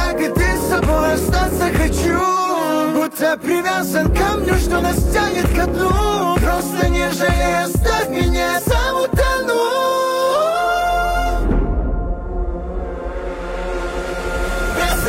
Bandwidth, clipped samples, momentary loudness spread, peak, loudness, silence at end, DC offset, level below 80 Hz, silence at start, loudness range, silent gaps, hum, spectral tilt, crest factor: 16 kHz; under 0.1%; 8 LU; -6 dBFS; -18 LUFS; 0 s; under 0.1%; -22 dBFS; 0 s; 5 LU; none; none; -5 dB/octave; 10 dB